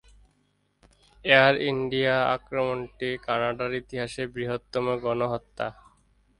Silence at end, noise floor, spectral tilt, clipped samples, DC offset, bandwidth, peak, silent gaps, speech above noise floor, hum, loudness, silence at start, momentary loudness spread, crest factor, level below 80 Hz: 0.7 s; -70 dBFS; -5.5 dB/octave; under 0.1%; under 0.1%; 11.5 kHz; -4 dBFS; none; 44 dB; none; -26 LUFS; 1.25 s; 13 LU; 24 dB; -56 dBFS